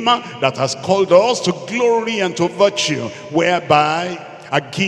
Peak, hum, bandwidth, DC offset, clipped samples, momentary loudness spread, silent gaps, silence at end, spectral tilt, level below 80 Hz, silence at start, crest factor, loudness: 0 dBFS; none; 12 kHz; under 0.1%; under 0.1%; 9 LU; none; 0 s; -4 dB/octave; -60 dBFS; 0 s; 16 dB; -17 LUFS